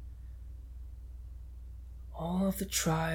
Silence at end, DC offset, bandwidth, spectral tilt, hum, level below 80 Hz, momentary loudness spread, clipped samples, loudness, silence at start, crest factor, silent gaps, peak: 0 s; under 0.1%; 19 kHz; -4.5 dB/octave; none; -46 dBFS; 18 LU; under 0.1%; -33 LUFS; 0 s; 18 dB; none; -18 dBFS